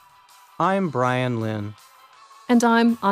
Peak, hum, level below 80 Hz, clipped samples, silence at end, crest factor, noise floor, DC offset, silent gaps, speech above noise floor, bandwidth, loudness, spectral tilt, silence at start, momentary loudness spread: -6 dBFS; none; -68 dBFS; under 0.1%; 0 s; 16 dB; -52 dBFS; under 0.1%; none; 31 dB; 14.5 kHz; -21 LUFS; -6 dB/octave; 0.6 s; 14 LU